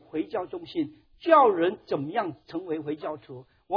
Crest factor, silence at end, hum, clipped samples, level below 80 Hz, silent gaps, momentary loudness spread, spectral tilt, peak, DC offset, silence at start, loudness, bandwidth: 20 dB; 0 s; none; under 0.1%; -68 dBFS; none; 18 LU; -8.5 dB/octave; -6 dBFS; under 0.1%; 0.15 s; -27 LUFS; 5.4 kHz